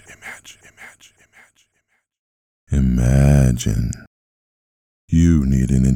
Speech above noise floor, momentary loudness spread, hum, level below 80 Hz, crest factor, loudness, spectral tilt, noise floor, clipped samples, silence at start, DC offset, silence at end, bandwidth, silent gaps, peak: 53 dB; 21 LU; none; -26 dBFS; 16 dB; -17 LUFS; -7 dB/octave; -69 dBFS; under 0.1%; 0.25 s; under 0.1%; 0 s; 15.5 kHz; 2.19-2.67 s, 4.07-5.08 s; -4 dBFS